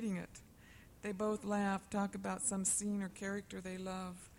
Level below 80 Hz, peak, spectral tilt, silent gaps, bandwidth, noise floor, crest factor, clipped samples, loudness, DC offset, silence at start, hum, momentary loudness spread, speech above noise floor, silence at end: -66 dBFS; -26 dBFS; -4.5 dB/octave; none; 16 kHz; -60 dBFS; 14 dB; under 0.1%; -39 LUFS; under 0.1%; 0 s; none; 11 LU; 21 dB; 0 s